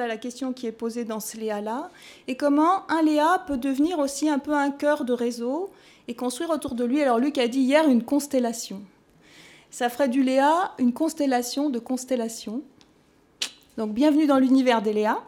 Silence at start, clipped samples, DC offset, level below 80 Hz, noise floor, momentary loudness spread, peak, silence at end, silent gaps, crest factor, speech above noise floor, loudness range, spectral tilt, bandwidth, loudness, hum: 0 s; under 0.1%; under 0.1%; -64 dBFS; -59 dBFS; 13 LU; -6 dBFS; 0 s; none; 18 dB; 36 dB; 3 LU; -4 dB/octave; 17 kHz; -24 LUFS; none